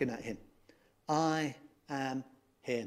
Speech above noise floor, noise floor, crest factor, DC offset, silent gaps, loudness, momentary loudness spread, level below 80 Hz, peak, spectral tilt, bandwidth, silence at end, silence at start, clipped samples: 31 dB; -66 dBFS; 20 dB; under 0.1%; none; -36 LUFS; 19 LU; -70 dBFS; -18 dBFS; -5 dB/octave; 15 kHz; 0 s; 0 s; under 0.1%